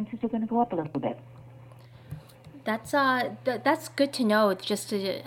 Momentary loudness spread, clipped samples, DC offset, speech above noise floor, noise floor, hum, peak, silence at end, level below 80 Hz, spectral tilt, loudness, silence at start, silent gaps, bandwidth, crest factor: 18 LU; under 0.1%; under 0.1%; 22 dB; -49 dBFS; none; -10 dBFS; 0 s; -66 dBFS; -4.5 dB/octave; -27 LUFS; 0 s; none; 17 kHz; 18 dB